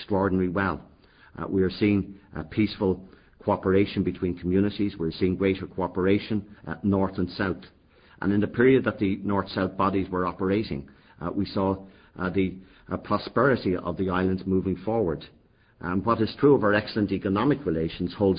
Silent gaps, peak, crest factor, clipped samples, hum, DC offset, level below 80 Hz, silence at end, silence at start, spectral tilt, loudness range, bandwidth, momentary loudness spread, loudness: none; -8 dBFS; 18 dB; under 0.1%; none; under 0.1%; -46 dBFS; 0 s; 0 s; -11.5 dB/octave; 3 LU; 5.2 kHz; 11 LU; -26 LUFS